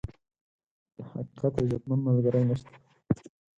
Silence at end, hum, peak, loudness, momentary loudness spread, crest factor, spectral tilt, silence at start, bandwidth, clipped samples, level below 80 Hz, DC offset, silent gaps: 0.3 s; none; -12 dBFS; -29 LUFS; 16 LU; 18 dB; -10 dB/octave; 0.05 s; 7.8 kHz; under 0.1%; -54 dBFS; under 0.1%; 0.41-0.59 s, 0.66-0.86 s